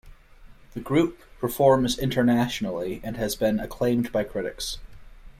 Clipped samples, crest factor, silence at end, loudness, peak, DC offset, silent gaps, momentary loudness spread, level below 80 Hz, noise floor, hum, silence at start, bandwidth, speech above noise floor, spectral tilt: under 0.1%; 20 dB; 0.1 s; -25 LUFS; -6 dBFS; under 0.1%; none; 12 LU; -46 dBFS; -49 dBFS; none; 0.05 s; 16 kHz; 24 dB; -5.5 dB/octave